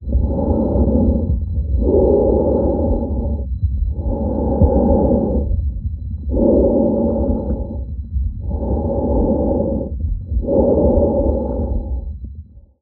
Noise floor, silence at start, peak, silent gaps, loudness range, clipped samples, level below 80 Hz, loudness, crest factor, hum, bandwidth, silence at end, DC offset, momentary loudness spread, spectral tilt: -37 dBFS; 0 s; 0 dBFS; none; 3 LU; under 0.1%; -22 dBFS; -18 LUFS; 16 dB; none; 1.6 kHz; 0.2 s; under 0.1%; 11 LU; -15.5 dB/octave